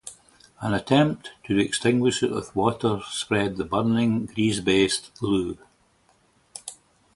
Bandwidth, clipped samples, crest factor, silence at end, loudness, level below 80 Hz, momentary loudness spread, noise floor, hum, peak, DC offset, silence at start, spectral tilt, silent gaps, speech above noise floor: 11.5 kHz; under 0.1%; 20 dB; 0.4 s; -24 LUFS; -52 dBFS; 18 LU; -63 dBFS; none; -4 dBFS; under 0.1%; 0.05 s; -5 dB/octave; none; 39 dB